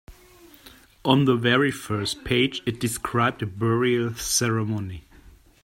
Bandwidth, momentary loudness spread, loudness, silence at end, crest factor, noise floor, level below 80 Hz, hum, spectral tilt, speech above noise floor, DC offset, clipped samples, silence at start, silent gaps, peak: 16 kHz; 9 LU; -23 LUFS; 0.35 s; 22 dB; -51 dBFS; -50 dBFS; none; -4.5 dB/octave; 28 dB; under 0.1%; under 0.1%; 0.1 s; none; -2 dBFS